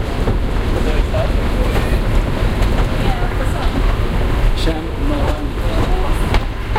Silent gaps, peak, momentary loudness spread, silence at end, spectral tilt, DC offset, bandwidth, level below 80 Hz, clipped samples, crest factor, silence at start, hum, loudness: none; -2 dBFS; 2 LU; 0 s; -6.5 dB/octave; under 0.1%; 15 kHz; -16 dBFS; under 0.1%; 12 dB; 0 s; none; -19 LUFS